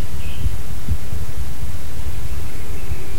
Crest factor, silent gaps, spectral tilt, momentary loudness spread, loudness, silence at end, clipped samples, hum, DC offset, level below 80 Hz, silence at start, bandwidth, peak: 18 dB; none; -5.5 dB/octave; 4 LU; -29 LUFS; 0 s; under 0.1%; none; 30%; -30 dBFS; 0 s; 16.5 kHz; -4 dBFS